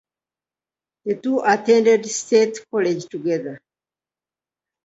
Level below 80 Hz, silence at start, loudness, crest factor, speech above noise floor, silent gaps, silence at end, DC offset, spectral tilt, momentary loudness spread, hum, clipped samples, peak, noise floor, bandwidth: -72 dBFS; 1.05 s; -19 LUFS; 18 dB; over 71 dB; none; 1.3 s; under 0.1%; -4 dB/octave; 11 LU; none; under 0.1%; -4 dBFS; under -90 dBFS; 8 kHz